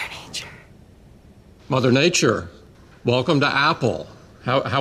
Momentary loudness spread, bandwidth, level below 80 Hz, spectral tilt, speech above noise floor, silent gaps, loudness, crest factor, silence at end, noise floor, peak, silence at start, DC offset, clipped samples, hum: 16 LU; 14.5 kHz; -52 dBFS; -4.5 dB/octave; 29 dB; none; -20 LUFS; 18 dB; 0 s; -48 dBFS; -4 dBFS; 0 s; under 0.1%; under 0.1%; none